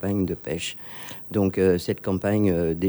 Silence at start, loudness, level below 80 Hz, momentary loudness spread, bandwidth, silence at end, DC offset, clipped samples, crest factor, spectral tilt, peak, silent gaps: 0 s; -24 LUFS; -50 dBFS; 12 LU; over 20 kHz; 0 s; under 0.1%; under 0.1%; 16 dB; -6.5 dB/octave; -8 dBFS; none